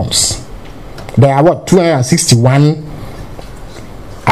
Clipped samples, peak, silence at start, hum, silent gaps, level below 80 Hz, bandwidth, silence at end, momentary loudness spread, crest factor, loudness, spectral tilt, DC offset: 0.1%; 0 dBFS; 0 s; none; none; -34 dBFS; 15.5 kHz; 0 s; 23 LU; 12 dB; -10 LUFS; -5 dB/octave; 1%